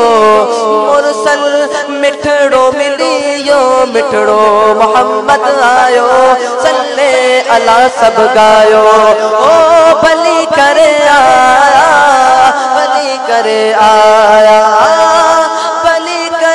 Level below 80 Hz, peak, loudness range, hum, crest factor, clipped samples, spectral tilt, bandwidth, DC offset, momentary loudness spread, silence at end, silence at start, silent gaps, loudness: -46 dBFS; 0 dBFS; 3 LU; none; 6 dB; 6%; -2.5 dB/octave; 12 kHz; 0.4%; 6 LU; 0 s; 0 s; none; -7 LUFS